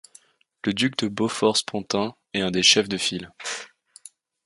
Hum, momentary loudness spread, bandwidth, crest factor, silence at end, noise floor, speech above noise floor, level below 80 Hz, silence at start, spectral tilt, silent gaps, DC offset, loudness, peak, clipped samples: none; 15 LU; 11.5 kHz; 22 dB; 0.8 s; -56 dBFS; 32 dB; -60 dBFS; 0.65 s; -3 dB/octave; none; under 0.1%; -23 LUFS; -4 dBFS; under 0.1%